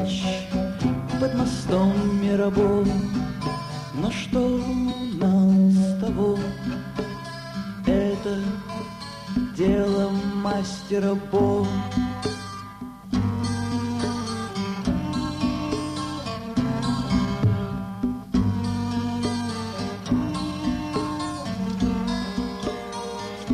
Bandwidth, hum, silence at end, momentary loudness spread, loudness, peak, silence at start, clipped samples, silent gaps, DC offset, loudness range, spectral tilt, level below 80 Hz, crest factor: 12 kHz; none; 0 s; 10 LU; -25 LUFS; -8 dBFS; 0 s; under 0.1%; none; under 0.1%; 5 LU; -6.5 dB/octave; -42 dBFS; 16 dB